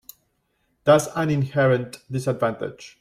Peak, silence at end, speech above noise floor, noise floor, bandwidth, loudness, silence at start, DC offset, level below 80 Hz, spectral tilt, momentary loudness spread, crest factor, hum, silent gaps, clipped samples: -4 dBFS; 0.15 s; 49 dB; -70 dBFS; 16 kHz; -22 LUFS; 0.85 s; under 0.1%; -60 dBFS; -6 dB/octave; 12 LU; 18 dB; none; none; under 0.1%